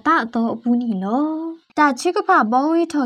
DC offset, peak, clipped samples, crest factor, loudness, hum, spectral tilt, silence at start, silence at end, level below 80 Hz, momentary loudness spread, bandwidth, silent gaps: under 0.1%; -4 dBFS; under 0.1%; 14 dB; -19 LUFS; none; -5 dB/octave; 0.05 s; 0 s; -68 dBFS; 7 LU; 12 kHz; none